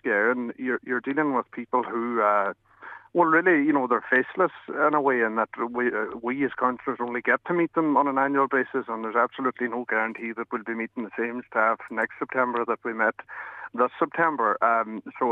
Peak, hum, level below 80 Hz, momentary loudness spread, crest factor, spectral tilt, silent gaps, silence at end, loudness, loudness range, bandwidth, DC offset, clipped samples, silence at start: -6 dBFS; none; -74 dBFS; 9 LU; 18 dB; -8 dB/octave; none; 0 s; -25 LUFS; 4 LU; 6.8 kHz; under 0.1%; under 0.1%; 0.05 s